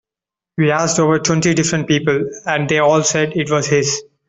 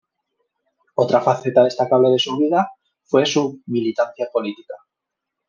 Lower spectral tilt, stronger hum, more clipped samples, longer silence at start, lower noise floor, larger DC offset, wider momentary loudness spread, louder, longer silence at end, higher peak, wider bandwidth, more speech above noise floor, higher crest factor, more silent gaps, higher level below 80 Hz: about the same, -4.5 dB/octave vs -5 dB/octave; neither; neither; second, 0.6 s vs 1 s; first, -88 dBFS vs -82 dBFS; neither; second, 6 LU vs 12 LU; first, -16 LUFS vs -19 LUFS; second, 0.25 s vs 0.7 s; about the same, -2 dBFS vs -2 dBFS; first, 8.4 kHz vs 7.4 kHz; first, 72 dB vs 64 dB; about the same, 14 dB vs 18 dB; neither; first, -52 dBFS vs -68 dBFS